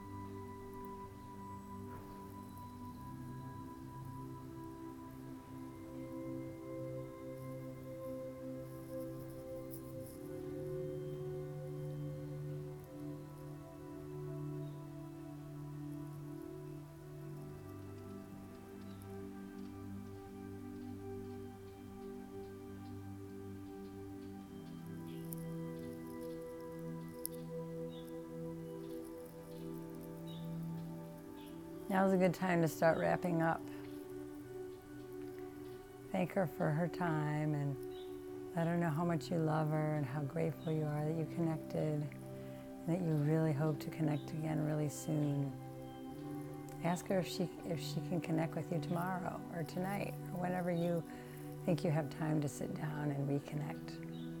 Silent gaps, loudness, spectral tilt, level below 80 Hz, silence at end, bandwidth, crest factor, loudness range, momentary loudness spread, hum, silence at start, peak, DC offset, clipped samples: none; -42 LUFS; -7 dB/octave; -66 dBFS; 0 s; 17 kHz; 24 dB; 12 LU; 14 LU; none; 0 s; -16 dBFS; under 0.1%; under 0.1%